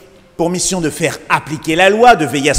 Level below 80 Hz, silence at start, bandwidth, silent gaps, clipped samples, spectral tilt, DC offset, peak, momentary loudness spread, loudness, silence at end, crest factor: -42 dBFS; 0.4 s; 16.5 kHz; none; 0.3%; -3.5 dB/octave; under 0.1%; 0 dBFS; 10 LU; -13 LUFS; 0 s; 14 dB